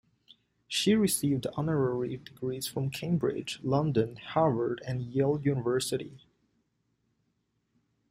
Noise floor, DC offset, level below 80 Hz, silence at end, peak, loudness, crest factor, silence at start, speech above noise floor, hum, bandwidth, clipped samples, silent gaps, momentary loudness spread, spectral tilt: -77 dBFS; under 0.1%; -62 dBFS; 1.95 s; -12 dBFS; -30 LUFS; 18 dB; 0.7 s; 48 dB; none; 16 kHz; under 0.1%; none; 9 LU; -5.5 dB/octave